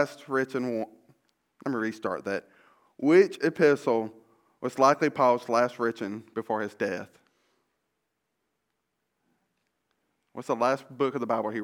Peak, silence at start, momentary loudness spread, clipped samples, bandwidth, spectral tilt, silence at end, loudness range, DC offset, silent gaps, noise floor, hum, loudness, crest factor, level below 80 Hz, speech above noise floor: -6 dBFS; 0 s; 14 LU; under 0.1%; 16 kHz; -6 dB/octave; 0 s; 13 LU; under 0.1%; none; -80 dBFS; none; -27 LUFS; 22 dB; -80 dBFS; 54 dB